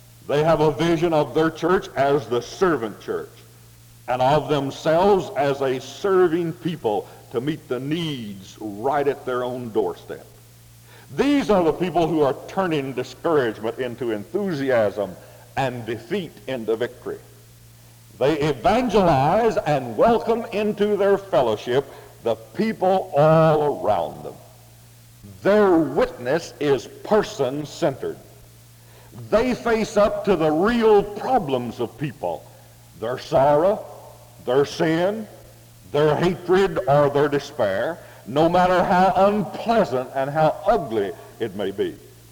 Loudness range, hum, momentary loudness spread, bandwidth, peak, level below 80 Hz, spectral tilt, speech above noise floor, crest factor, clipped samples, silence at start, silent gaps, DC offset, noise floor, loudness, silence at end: 6 LU; none; 12 LU; over 20 kHz; -4 dBFS; -48 dBFS; -6.5 dB/octave; 27 dB; 16 dB; under 0.1%; 0.25 s; none; under 0.1%; -48 dBFS; -21 LUFS; 0.3 s